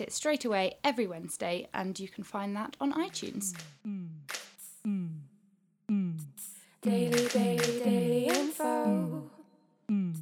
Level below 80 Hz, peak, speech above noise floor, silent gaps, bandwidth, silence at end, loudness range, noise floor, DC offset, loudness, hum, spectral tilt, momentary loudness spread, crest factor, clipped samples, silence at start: -78 dBFS; -14 dBFS; 38 dB; none; 20 kHz; 0 s; 8 LU; -69 dBFS; under 0.1%; -32 LUFS; none; -5 dB/octave; 14 LU; 20 dB; under 0.1%; 0 s